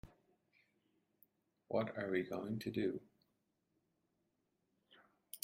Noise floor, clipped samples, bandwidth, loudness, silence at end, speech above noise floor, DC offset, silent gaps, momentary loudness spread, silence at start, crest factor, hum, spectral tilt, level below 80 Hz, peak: -84 dBFS; under 0.1%; 16 kHz; -41 LUFS; 0.05 s; 44 dB; under 0.1%; none; 7 LU; 0.05 s; 24 dB; none; -6.5 dB/octave; -76 dBFS; -22 dBFS